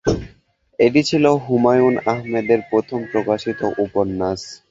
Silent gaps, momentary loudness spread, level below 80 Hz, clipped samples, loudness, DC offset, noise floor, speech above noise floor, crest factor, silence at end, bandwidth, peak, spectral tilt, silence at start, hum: none; 8 LU; -44 dBFS; under 0.1%; -18 LUFS; under 0.1%; -54 dBFS; 37 dB; 16 dB; 0.15 s; 8 kHz; -2 dBFS; -6 dB/octave; 0.05 s; none